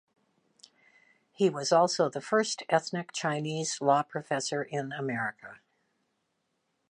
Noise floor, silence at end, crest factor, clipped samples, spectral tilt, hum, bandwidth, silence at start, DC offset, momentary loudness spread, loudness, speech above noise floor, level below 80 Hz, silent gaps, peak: -78 dBFS; 1.35 s; 20 dB; under 0.1%; -4 dB/octave; none; 11 kHz; 1.4 s; under 0.1%; 9 LU; -29 LUFS; 49 dB; -82 dBFS; none; -10 dBFS